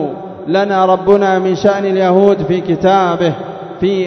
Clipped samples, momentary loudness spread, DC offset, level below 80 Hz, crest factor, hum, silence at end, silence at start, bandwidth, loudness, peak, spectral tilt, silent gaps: 0.2%; 10 LU; under 0.1%; -48 dBFS; 12 dB; none; 0 s; 0 s; 6.4 kHz; -12 LUFS; 0 dBFS; -7 dB/octave; none